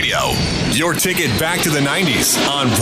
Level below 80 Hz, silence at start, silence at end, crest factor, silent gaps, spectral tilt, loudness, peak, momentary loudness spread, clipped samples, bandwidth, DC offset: -36 dBFS; 0 s; 0 s; 12 dB; none; -3 dB/octave; -15 LUFS; -4 dBFS; 3 LU; under 0.1%; 15.5 kHz; under 0.1%